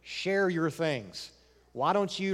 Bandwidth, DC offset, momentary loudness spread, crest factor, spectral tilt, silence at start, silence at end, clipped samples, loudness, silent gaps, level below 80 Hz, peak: 14.5 kHz; under 0.1%; 16 LU; 18 dB; -5 dB/octave; 0.05 s; 0 s; under 0.1%; -30 LUFS; none; -68 dBFS; -14 dBFS